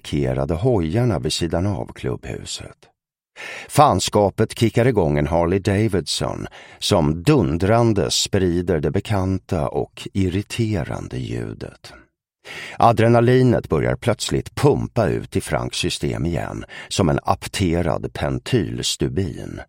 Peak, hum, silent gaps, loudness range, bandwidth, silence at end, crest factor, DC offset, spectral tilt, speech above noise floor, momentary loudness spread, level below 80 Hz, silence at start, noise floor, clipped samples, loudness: 0 dBFS; none; none; 5 LU; 16.5 kHz; 0.05 s; 20 dB; under 0.1%; -5.5 dB/octave; 25 dB; 12 LU; -38 dBFS; 0.05 s; -45 dBFS; under 0.1%; -20 LUFS